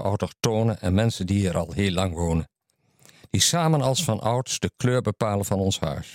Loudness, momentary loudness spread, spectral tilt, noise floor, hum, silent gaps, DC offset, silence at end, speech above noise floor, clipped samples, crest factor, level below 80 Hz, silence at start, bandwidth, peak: -24 LUFS; 6 LU; -5 dB/octave; -65 dBFS; none; none; under 0.1%; 0 s; 41 dB; under 0.1%; 18 dB; -48 dBFS; 0 s; 16.5 kHz; -6 dBFS